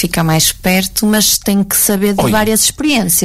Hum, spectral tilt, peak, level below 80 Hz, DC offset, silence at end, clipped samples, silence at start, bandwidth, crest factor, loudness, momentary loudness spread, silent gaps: none; -3.5 dB/octave; -2 dBFS; -34 dBFS; under 0.1%; 0 s; under 0.1%; 0 s; 16.5 kHz; 12 dB; -11 LUFS; 3 LU; none